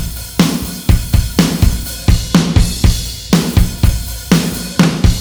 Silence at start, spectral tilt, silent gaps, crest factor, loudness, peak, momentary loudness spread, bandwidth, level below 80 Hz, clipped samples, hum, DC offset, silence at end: 0 s; -5 dB/octave; none; 12 dB; -14 LUFS; 0 dBFS; 5 LU; over 20 kHz; -18 dBFS; under 0.1%; none; under 0.1%; 0 s